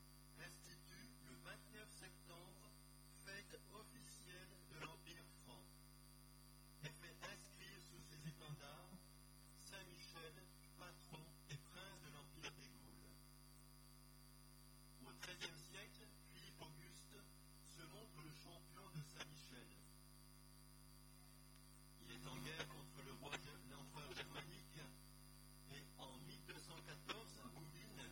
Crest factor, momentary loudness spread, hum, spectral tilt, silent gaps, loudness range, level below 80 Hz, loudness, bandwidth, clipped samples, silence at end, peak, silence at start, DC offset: 24 dB; 12 LU; 50 Hz at -65 dBFS; -3.5 dB/octave; none; 5 LU; -70 dBFS; -59 LUFS; 17.5 kHz; under 0.1%; 0 s; -36 dBFS; 0 s; under 0.1%